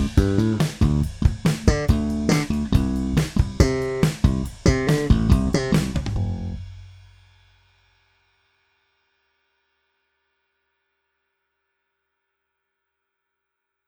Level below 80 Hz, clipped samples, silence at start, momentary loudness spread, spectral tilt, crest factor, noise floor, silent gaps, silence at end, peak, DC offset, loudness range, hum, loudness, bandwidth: -30 dBFS; under 0.1%; 0 s; 7 LU; -6.5 dB/octave; 22 dB; -81 dBFS; none; 6.95 s; -2 dBFS; under 0.1%; 10 LU; none; -21 LUFS; 16 kHz